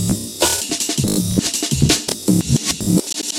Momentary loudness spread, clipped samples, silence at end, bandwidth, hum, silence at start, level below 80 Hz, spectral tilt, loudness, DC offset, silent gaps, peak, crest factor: 3 LU; under 0.1%; 0 s; 17 kHz; none; 0 s; -36 dBFS; -3.5 dB/octave; -17 LUFS; under 0.1%; none; 0 dBFS; 18 dB